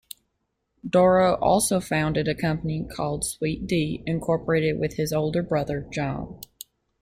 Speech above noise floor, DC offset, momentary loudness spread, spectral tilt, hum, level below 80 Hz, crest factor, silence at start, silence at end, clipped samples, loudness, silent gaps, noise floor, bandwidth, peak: 53 dB; under 0.1%; 20 LU; -5.5 dB/octave; none; -48 dBFS; 18 dB; 0.85 s; 0.55 s; under 0.1%; -24 LUFS; none; -76 dBFS; 16.5 kHz; -8 dBFS